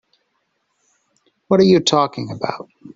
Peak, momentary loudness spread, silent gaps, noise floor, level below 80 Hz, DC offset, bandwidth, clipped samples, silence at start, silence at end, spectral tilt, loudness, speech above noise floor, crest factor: -2 dBFS; 13 LU; none; -69 dBFS; -58 dBFS; under 0.1%; 8 kHz; under 0.1%; 1.5 s; 0.1 s; -5.5 dB/octave; -17 LUFS; 53 dB; 18 dB